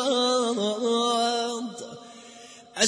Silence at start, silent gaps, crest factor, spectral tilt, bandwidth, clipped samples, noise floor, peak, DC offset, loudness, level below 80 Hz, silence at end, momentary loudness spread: 0 s; none; 20 dB; -2 dB/octave; 10.5 kHz; under 0.1%; -47 dBFS; -6 dBFS; under 0.1%; -25 LUFS; -80 dBFS; 0 s; 22 LU